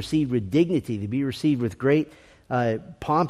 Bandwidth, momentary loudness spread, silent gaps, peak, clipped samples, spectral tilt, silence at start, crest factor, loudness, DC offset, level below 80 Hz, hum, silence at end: 13.5 kHz; 6 LU; none; -8 dBFS; under 0.1%; -7.5 dB/octave; 0 s; 16 dB; -25 LUFS; under 0.1%; -54 dBFS; none; 0 s